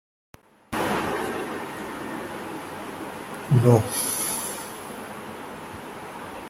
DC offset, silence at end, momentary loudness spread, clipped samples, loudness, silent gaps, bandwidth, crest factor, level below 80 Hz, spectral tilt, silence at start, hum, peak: under 0.1%; 0 s; 17 LU; under 0.1%; -27 LUFS; none; 16.5 kHz; 24 dB; -56 dBFS; -5 dB/octave; 0.7 s; none; -4 dBFS